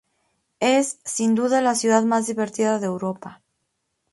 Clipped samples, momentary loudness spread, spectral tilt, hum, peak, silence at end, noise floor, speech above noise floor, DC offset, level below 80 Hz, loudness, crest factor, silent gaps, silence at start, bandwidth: under 0.1%; 10 LU; -4 dB/octave; none; -4 dBFS; 0.8 s; -75 dBFS; 54 dB; under 0.1%; -70 dBFS; -21 LUFS; 20 dB; none; 0.6 s; 12 kHz